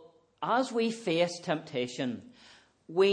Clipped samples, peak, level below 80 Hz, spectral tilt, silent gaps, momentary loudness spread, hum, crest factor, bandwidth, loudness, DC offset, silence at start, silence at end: under 0.1%; -14 dBFS; -80 dBFS; -5 dB/octave; none; 8 LU; none; 18 dB; 10 kHz; -31 LUFS; under 0.1%; 0.05 s; 0 s